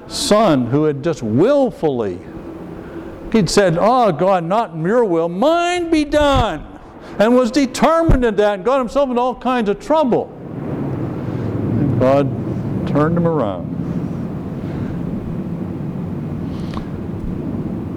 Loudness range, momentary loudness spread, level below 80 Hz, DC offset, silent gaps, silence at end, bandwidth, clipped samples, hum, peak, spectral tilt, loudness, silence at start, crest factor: 8 LU; 12 LU; -32 dBFS; under 0.1%; none; 0 s; 15.5 kHz; under 0.1%; none; -6 dBFS; -6.5 dB/octave; -17 LUFS; 0 s; 12 dB